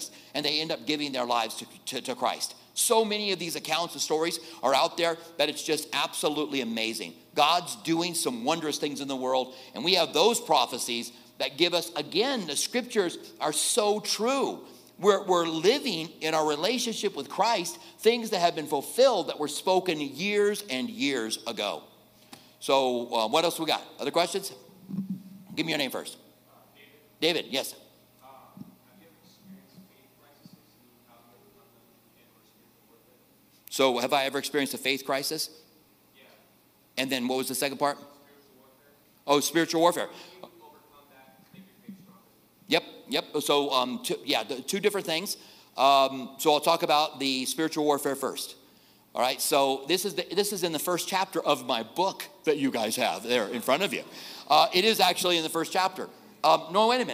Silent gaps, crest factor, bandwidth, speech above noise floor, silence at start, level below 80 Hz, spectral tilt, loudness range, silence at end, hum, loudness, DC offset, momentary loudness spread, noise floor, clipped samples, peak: none; 22 dB; 16 kHz; 35 dB; 0 s; -80 dBFS; -2.5 dB/octave; 7 LU; 0 s; none; -27 LUFS; under 0.1%; 10 LU; -62 dBFS; under 0.1%; -6 dBFS